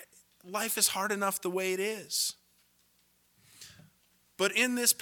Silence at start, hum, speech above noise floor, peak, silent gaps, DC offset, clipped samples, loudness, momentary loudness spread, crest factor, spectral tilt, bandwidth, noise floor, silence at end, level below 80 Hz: 0 s; 60 Hz at -70 dBFS; 39 dB; -10 dBFS; none; under 0.1%; under 0.1%; -29 LUFS; 25 LU; 24 dB; -1 dB/octave; 19 kHz; -69 dBFS; 0.05 s; -80 dBFS